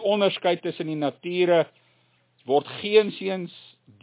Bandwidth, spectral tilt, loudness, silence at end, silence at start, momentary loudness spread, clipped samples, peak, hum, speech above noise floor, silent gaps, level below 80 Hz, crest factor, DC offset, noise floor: 4 kHz; -9.5 dB/octave; -24 LUFS; 0.45 s; 0 s; 11 LU; under 0.1%; -6 dBFS; none; 41 dB; none; -78 dBFS; 18 dB; under 0.1%; -65 dBFS